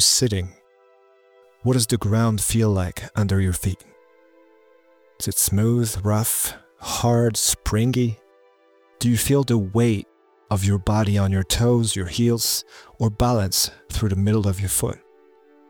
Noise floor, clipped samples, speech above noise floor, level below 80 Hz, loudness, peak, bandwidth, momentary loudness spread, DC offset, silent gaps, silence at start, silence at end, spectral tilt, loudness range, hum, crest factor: -57 dBFS; under 0.1%; 36 dB; -42 dBFS; -21 LUFS; -4 dBFS; over 20 kHz; 8 LU; under 0.1%; none; 0 s; 0.7 s; -4.5 dB/octave; 3 LU; none; 18 dB